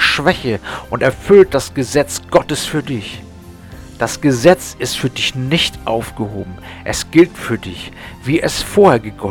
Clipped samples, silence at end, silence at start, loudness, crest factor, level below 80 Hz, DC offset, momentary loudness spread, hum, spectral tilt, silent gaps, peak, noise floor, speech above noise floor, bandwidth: 0.1%; 0 s; 0 s; -15 LUFS; 16 dB; -38 dBFS; under 0.1%; 17 LU; none; -4.5 dB/octave; none; 0 dBFS; -35 dBFS; 20 dB; 18.5 kHz